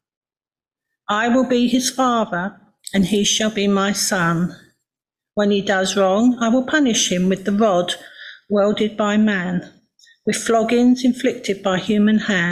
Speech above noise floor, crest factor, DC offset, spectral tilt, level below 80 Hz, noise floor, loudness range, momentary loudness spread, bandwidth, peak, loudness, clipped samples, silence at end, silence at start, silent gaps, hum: over 73 dB; 14 dB; under 0.1%; -4 dB/octave; -54 dBFS; under -90 dBFS; 2 LU; 9 LU; 14.5 kHz; -4 dBFS; -18 LUFS; under 0.1%; 0 s; 1.1 s; none; none